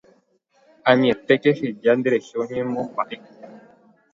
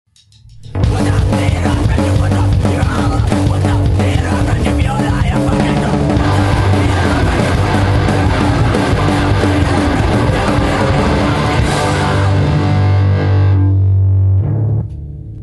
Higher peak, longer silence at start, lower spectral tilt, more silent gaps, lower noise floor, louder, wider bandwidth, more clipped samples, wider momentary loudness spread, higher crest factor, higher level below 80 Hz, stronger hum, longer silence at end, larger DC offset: about the same, 0 dBFS vs 0 dBFS; first, 0.85 s vs 0.6 s; about the same, -6.5 dB/octave vs -7 dB/octave; neither; first, -62 dBFS vs -42 dBFS; second, -21 LUFS vs -13 LUFS; second, 7.6 kHz vs 12 kHz; neither; first, 10 LU vs 3 LU; first, 22 dB vs 12 dB; second, -66 dBFS vs -22 dBFS; neither; first, 0.55 s vs 0 s; neither